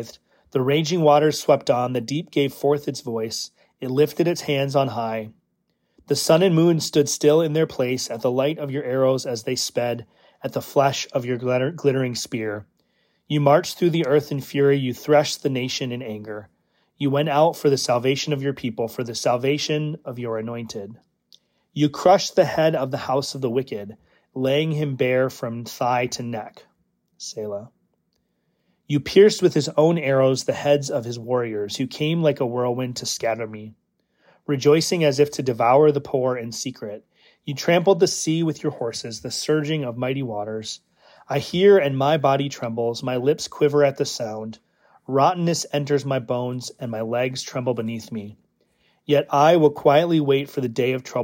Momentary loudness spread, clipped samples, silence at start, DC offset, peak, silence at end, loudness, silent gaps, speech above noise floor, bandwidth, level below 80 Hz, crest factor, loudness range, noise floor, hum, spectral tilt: 14 LU; under 0.1%; 0 s; under 0.1%; -4 dBFS; 0 s; -21 LUFS; none; 50 dB; 16.5 kHz; -66 dBFS; 18 dB; 5 LU; -71 dBFS; none; -5 dB/octave